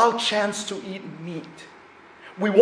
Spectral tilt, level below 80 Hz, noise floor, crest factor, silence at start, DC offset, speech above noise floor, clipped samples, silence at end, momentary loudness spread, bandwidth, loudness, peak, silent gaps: -4 dB/octave; -70 dBFS; -48 dBFS; 20 dB; 0 s; under 0.1%; 22 dB; under 0.1%; 0 s; 23 LU; 10.5 kHz; -26 LUFS; -2 dBFS; none